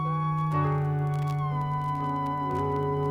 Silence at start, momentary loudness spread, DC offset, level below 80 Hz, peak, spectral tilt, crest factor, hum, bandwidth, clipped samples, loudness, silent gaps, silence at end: 0 s; 3 LU; under 0.1%; -58 dBFS; -16 dBFS; -9 dB/octave; 12 dB; none; 6.4 kHz; under 0.1%; -28 LUFS; none; 0 s